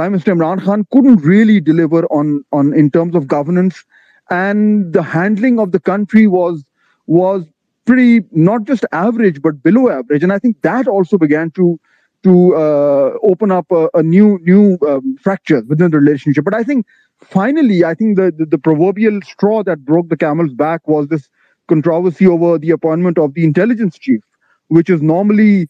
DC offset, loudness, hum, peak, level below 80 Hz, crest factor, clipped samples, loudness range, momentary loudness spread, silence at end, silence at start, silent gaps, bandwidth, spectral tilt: under 0.1%; -12 LUFS; none; 0 dBFS; -60 dBFS; 12 dB; under 0.1%; 3 LU; 7 LU; 0.05 s; 0 s; none; 7.2 kHz; -9.5 dB/octave